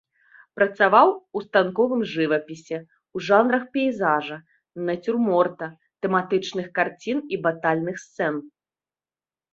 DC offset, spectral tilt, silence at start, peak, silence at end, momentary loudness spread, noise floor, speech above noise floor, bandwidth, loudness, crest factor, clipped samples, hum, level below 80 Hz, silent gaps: under 0.1%; -6 dB/octave; 0.55 s; -2 dBFS; 1.05 s; 15 LU; under -90 dBFS; over 68 dB; 7.8 kHz; -23 LUFS; 20 dB; under 0.1%; none; -70 dBFS; none